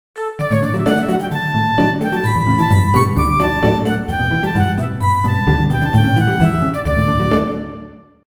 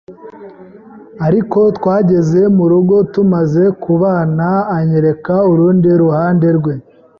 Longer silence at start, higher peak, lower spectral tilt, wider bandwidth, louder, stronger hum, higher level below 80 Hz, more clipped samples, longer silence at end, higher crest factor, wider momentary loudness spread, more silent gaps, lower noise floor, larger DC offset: about the same, 0.15 s vs 0.1 s; about the same, 0 dBFS vs -2 dBFS; second, -7 dB/octave vs -10.5 dB/octave; first, over 20 kHz vs 6.8 kHz; second, -16 LUFS vs -12 LUFS; neither; first, -30 dBFS vs -48 dBFS; neither; about the same, 0.3 s vs 0.4 s; first, 16 dB vs 10 dB; about the same, 5 LU vs 4 LU; neither; about the same, -37 dBFS vs -36 dBFS; neither